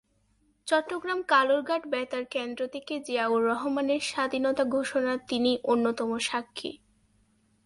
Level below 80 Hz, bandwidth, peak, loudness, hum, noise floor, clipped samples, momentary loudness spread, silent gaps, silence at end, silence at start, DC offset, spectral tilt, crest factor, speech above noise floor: -70 dBFS; 11.5 kHz; -10 dBFS; -28 LUFS; none; -68 dBFS; under 0.1%; 9 LU; none; 0.9 s; 0.65 s; under 0.1%; -3 dB/octave; 18 dB; 41 dB